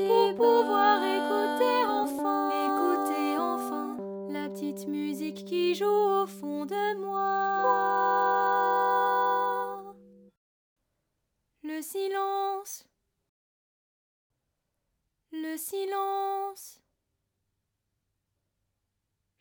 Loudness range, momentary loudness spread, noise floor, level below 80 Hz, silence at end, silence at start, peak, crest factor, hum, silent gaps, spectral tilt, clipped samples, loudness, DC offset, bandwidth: 11 LU; 13 LU; -82 dBFS; -78 dBFS; 2.65 s; 0 s; -10 dBFS; 20 dB; none; 10.37-10.76 s, 13.29-14.30 s; -4 dB/octave; under 0.1%; -28 LUFS; under 0.1%; over 20 kHz